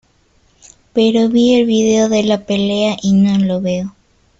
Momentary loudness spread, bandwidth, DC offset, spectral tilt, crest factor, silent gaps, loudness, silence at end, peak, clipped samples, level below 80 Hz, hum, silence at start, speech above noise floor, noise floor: 8 LU; 7.8 kHz; under 0.1%; -5.5 dB/octave; 12 dB; none; -14 LUFS; 0.5 s; -2 dBFS; under 0.1%; -50 dBFS; none; 0.95 s; 42 dB; -55 dBFS